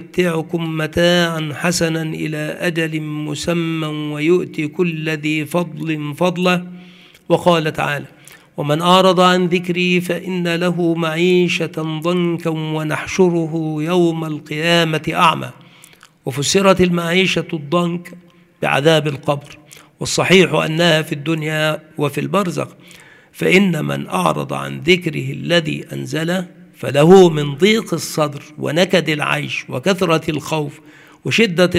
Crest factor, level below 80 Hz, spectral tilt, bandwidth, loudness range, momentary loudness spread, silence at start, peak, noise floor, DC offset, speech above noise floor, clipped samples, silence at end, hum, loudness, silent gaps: 16 dB; -52 dBFS; -5 dB/octave; 15.5 kHz; 4 LU; 10 LU; 0 s; 0 dBFS; -46 dBFS; under 0.1%; 29 dB; under 0.1%; 0 s; none; -17 LUFS; none